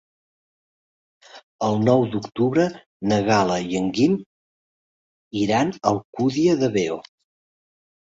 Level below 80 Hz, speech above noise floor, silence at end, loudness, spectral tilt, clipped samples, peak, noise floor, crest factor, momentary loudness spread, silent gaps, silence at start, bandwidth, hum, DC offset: -58 dBFS; over 70 dB; 1.1 s; -21 LUFS; -6 dB/octave; under 0.1%; -4 dBFS; under -90 dBFS; 20 dB; 8 LU; 1.43-1.59 s, 2.86-3.00 s, 4.26-5.31 s, 6.05-6.13 s; 1.35 s; 7.8 kHz; none; under 0.1%